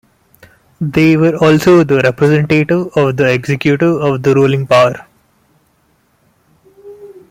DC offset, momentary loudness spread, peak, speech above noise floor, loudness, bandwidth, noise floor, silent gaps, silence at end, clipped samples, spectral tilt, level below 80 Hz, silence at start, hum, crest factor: under 0.1%; 5 LU; 0 dBFS; 46 dB; -11 LUFS; 16 kHz; -56 dBFS; none; 0.2 s; under 0.1%; -7 dB/octave; -48 dBFS; 0.8 s; none; 12 dB